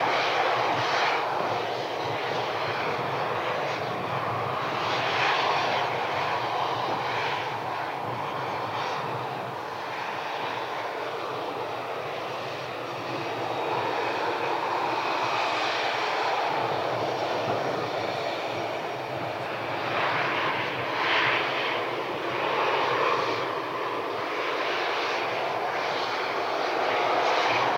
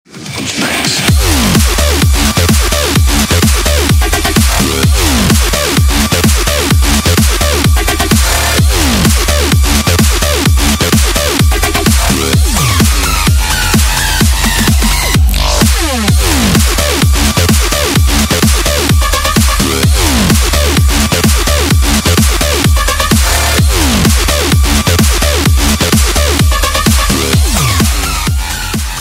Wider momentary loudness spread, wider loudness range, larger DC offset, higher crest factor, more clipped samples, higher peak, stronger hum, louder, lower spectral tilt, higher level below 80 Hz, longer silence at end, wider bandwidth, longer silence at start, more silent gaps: first, 8 LU vs 1 LU; first, 5 LU vs 0 LU; neither; first, 18 dB vs 10 dB; neither; second, -10 dBFS vs 0 dBFS; neither; second, -27 LUFS vs -9 LUFS; about the same, -4 dB/octave vs -3.5 dB/octave; second, -72 dBFS vs -14 dBFS; about the same, 0 s vs 0 s; about the same, 16 kHz vs 16.5 kHz; second, 0 s vs 0.15 s; neither